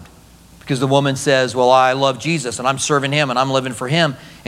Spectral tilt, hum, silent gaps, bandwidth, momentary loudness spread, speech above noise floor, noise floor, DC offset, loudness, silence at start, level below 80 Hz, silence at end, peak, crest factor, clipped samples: -4.5 dB/octave; none; none; 15 kHz; 7 LU; 28 dB; -45 dBFS; under 0.1%; -16 LUFS; 0 s; -52 dBFS; 0.1 s; 0 dBFS; 16 dB; under 0.1%